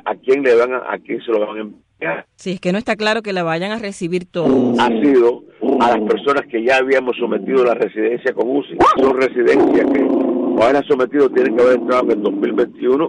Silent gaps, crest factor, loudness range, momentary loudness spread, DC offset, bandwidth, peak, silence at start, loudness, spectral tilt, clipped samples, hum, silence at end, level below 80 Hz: none; 10 dB; 5 LU; 10 LU; under 0.1%; 10.5 kHz; -4 dBFS; 0.05 s; -16 LUFS; -6 dB/octave; under 0.1%; none; 0 s; -52 dBFS